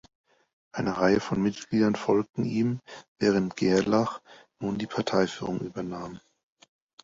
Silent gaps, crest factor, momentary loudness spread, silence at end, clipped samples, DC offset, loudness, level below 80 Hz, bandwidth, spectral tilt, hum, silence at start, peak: 3.08-3.16 s; 18 dB; 13 LU; 0.85 s; under 0.1%; under 0.1%; -27 LUFS; -60 dBFS; 7.8 kHz; -6 dB/octave; none; 0.75 s; -10 dBFS